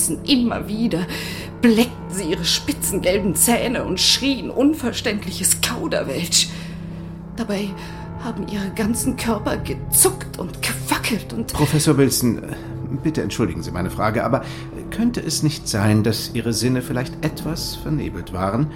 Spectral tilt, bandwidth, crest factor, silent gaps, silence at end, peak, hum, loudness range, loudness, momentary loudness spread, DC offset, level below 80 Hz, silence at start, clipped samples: -4 dB/octave; 17 kHz; 18 dB; none; 0 s; -2 dBFS; none; 5 LU; -20 LUFS; 13 LU; 0.2%; -38 dBFS; 0 s; under 0.1%